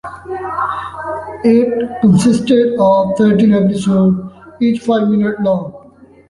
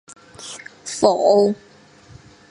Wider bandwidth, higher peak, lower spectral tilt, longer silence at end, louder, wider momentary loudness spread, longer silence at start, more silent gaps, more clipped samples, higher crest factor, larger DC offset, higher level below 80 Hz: about the same, 11.5 kHz vs 11.5 kHz; about the same, -2 dBFS vs 0 dBFS; first, -7.5 dB/octave vs -4.5 dB/octave; second, 0.5 s vs 0.95 s; first, -13 LUFS vs -17 LUFS; second, 13 LU vs 20 LU; second, 0.05 s vs 0.4 s; neither; neither; second, 12 dB vs 20 dB; neither; first, -46 dBFS vs -60 dBFS